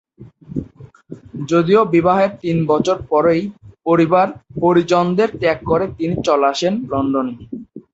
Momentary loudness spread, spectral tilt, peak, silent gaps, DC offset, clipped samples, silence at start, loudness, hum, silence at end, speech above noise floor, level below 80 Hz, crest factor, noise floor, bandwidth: 15 LU; -6.5 dB/octave; -2 dBFS; none; under 0.1%; under 0.1%; 0.2 s; -16 LUFS; none; 0.15 s; 24 dB; -48 dBFS; 16 dB; -40 dBFS; 8 kHz